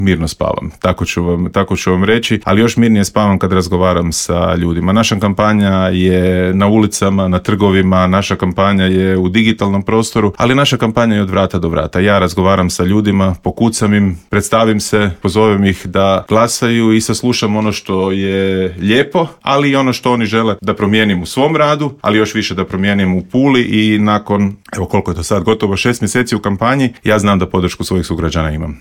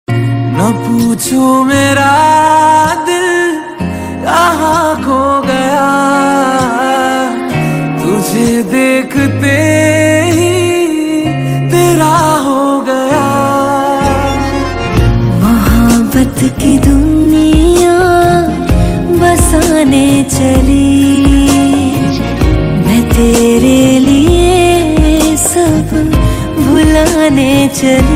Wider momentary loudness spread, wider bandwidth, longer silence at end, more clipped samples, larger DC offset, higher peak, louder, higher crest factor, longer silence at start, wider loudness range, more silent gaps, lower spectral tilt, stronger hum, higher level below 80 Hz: about the same, 5 LU vs 5 LU; about the same, 16.5 kHz vs 16.5 kHz; about the same, 0.05 s vs 0 s; second, under 0.1% vs 0.6%; neither; about the same, 0 dBFS vs 0 dBFS; second, -13 LUFS vs -9 LUFS; about the same, 12 dB vs 8 dB; about the same, 0 s vs 0.1 s; about the same, 2 LU vs 3 LU; neither; about the same, -5.5 dB/octave vs -5.5 dB/octave; neither; second, -34 dBFS vs -20 dBFS